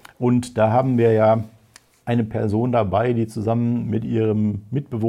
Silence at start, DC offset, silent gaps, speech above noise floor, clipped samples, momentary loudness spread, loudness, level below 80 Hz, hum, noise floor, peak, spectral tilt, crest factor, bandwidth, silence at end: 0.2 s; under 0.1%; none; 34 dB; under 0.1%; 7 LU; -20 LUFS; -56 dBFS; none; -53 dBFS; -6 dBFS; -8.5 dB/octave; 14 dB; 11.5 kHz; 0 s